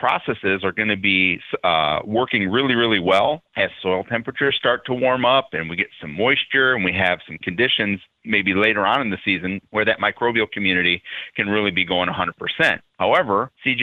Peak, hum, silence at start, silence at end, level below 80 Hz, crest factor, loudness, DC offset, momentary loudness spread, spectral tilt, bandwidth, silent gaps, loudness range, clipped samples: -4 dBFS; none; 0 s; 0 s; -56 dBFS; 18 dB; -19 LUFS; under 0.1%; 7 LU; -6 dB/octave; 11 kHz; none; 1 LU; under 0.1%